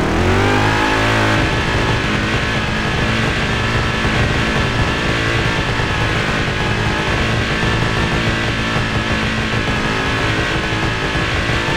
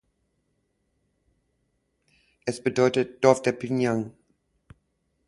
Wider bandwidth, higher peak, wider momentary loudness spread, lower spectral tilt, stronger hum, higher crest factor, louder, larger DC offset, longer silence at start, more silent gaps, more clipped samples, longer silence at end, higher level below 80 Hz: first, 13.5 kHz vs 11.5 kHz; about the same, -2 dBFS vs -2 dBFS; second, 3 LU vs 12 LU; about the same, -5 dB/octave vs -5.5 dB/octave; neither; second, 16 dB vs 26 dB; first, -16 LUFS vs -24 LUFS; neither; second, 0 s vs 2.45 s; neither; neither; second, 0 s vs 1.2 s; first, -26 dBFS vs -64 dBFS